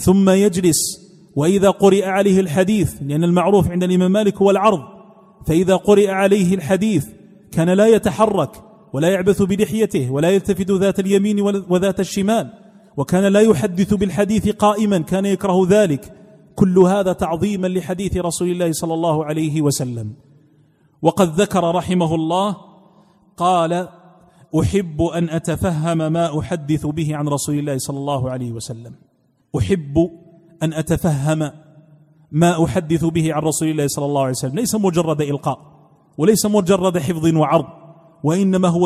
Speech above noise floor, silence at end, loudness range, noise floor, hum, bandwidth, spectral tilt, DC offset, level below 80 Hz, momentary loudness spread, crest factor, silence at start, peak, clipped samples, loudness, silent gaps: 44 dB; 0 s; 5 LU; -60 dBFS; none; 15.5 kHz; -6 dB/octave; under 0.1%; -44 dBFS; 10 LU; 16 dB; 0 s; 0 dBFS; under 0.1%; -17 LUFS; none